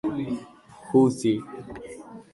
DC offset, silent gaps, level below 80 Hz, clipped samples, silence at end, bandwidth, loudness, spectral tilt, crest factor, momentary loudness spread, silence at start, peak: under 0.1%; none; -60 dBFS; under 0.1%; 0.15 s; 11.5 kHz; -24 LUFS; -7 dB/octave; 18 dB; 20 LU; 0.05 s; -8 dBFS